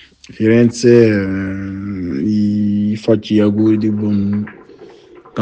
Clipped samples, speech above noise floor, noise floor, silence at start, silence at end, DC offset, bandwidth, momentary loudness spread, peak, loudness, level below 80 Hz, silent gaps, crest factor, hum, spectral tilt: under 0.1%; 28 dB; -41 dBFS; 0.3 s; 0 s; under 0.1%; 9 kHz; 13 LU; 0 dBFS; -15 LUFS; -50 dBFS; none; 14 dB; none; -7.5 dB/octave